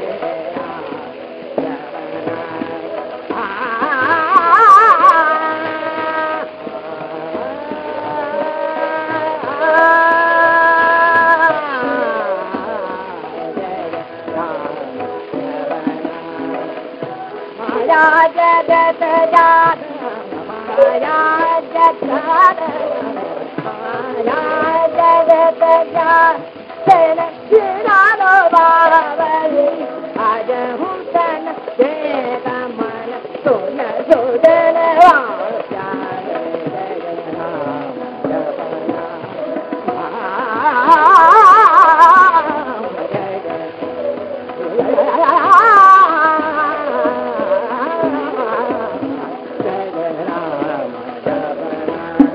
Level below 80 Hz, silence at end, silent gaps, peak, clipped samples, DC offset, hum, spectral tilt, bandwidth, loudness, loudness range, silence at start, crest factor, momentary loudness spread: -60 dBFS; 0 s; none; 0 dBFS; under 0.1%; under 0.1%; none; -5.5 dB/octave; 9 kHz; -13 LUFS; 12 LU; 0 s; 14 dB; 17 LU